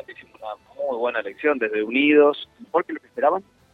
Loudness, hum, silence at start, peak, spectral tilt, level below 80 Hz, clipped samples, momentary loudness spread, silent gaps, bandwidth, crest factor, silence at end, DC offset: -22 LUFS; none; 0.1 s; -4 dBFS; -6.5 dB/octave; -68 dBFS; under 0.1%; 20 LU; none; 4.6 kHz; 18 dB; 0.35 s; under 0.1%